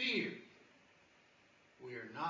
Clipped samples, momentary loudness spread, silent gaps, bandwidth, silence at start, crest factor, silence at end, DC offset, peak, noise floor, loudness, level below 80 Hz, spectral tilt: under 0.1%; 28 LU; none; 7.6 kHz; 0 s; 20 dB; 0 s; under 0.1%; -24 dBFS; -68 dBFS; -42 LUFS; -88 dBFS; -4.5 dB/octave